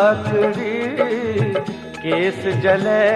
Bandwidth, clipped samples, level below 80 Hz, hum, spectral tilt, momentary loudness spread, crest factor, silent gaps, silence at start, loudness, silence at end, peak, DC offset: 11.5 kHz; under 0.1%; -54 dBFS; none; -7 dB/octave; 7 LU; 16 dB; none; 0 s; -19 LUFS; 0 s; -2 dBFS; under 0.1%